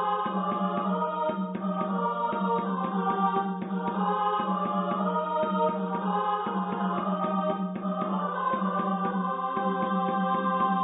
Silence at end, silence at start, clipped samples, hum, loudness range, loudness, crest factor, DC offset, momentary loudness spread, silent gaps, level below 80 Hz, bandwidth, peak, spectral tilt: 0 s; 0 s; under 0.1%; none; 1 LU; -28 LUFS; 14 dB; under 0.1%; 3 LU; none; -72 dBFS; 4 kHz; -14 dBFS; -11 dB/octave